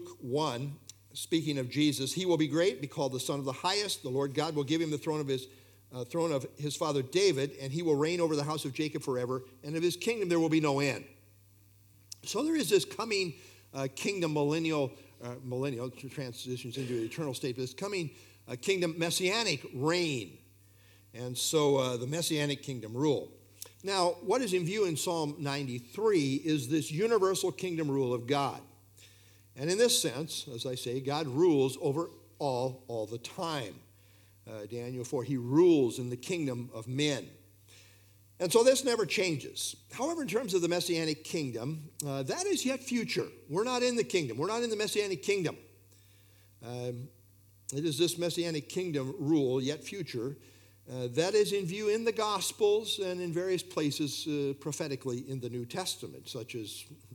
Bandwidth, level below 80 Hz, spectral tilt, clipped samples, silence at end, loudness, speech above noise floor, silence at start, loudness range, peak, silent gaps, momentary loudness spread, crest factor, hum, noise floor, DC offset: 19 kHz; -76 dBFS; -4.5 dB/octave; under 0.1%; 0 s; -32 LUFS; 29 dB; 0 s; 5 LU; -12 dBFS; none; 12 LU; 22 dB; none; -61 dBFS; under 0.1%